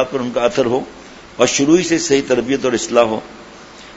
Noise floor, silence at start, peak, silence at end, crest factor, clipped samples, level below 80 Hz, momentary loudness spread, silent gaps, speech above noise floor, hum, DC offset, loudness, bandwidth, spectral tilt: -38 dBFS; 0 s; 0 dBFS; 0 s; 16 dB; under 0.1%; -50 dBFS; 18 LU; none; 22 dB; none; under 0.1%; -16 LUFS; 8 kHz; -4 dB/octave